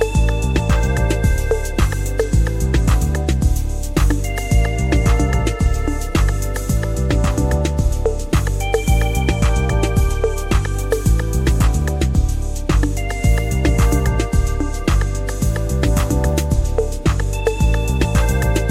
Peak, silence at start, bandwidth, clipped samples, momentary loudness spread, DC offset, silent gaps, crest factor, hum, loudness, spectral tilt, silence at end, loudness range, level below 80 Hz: -2 dBFS; 0 s; 15.5 kHz; under 0.1%; 4 LU; under 0.1%; none; 14 dB; none; -18 LUFS; -6 dB/octave; 0 s; 1 LU; -18 dBFS